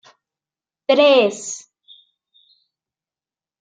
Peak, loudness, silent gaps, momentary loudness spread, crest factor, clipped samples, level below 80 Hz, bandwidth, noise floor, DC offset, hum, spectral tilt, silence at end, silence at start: -2 dBFS; -16 LUFS; none; 18 LU; 20 dB; under 0.1%; -76 dBFS; 9.4 kHz; under -90 dBFS; under 0.1%; none; -2.5 dB/octave; 2.05 s; 0.9 s